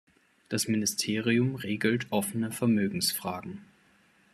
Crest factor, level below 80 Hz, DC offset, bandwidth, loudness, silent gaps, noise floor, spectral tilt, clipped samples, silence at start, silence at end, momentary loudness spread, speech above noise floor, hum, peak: 18 dB; -70 dBFS; under 0.1%; 14.5 kHz; -29 LUFS; none; -64 dBFS; -4 dB/octave; under 0.1%; 0.5 s; 0.7 s; 9 LU; 35 dB; none; -12 dBFS